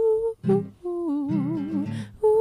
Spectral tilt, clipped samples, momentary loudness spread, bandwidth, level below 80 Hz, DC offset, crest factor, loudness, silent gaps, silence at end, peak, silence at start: -9.5 dB/octave; under 0.1%; 7 LU; 10.5 kHz; -56 dBFS; under 0.1%; 12 dB; -26 LUFS; none; 0 s; -12 dBFS; 0 s